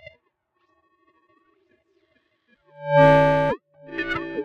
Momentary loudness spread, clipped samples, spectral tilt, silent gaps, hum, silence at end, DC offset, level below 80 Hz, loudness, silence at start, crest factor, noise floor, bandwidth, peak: 19 LU; under 0.1%; -7.5 dB/octave; none; none; 0 s; under 0.1%; -48 dBFS; -19 LUFS; 2.8 s; 20 dB; -71 dBFS; 7 kHz; -4 dBFS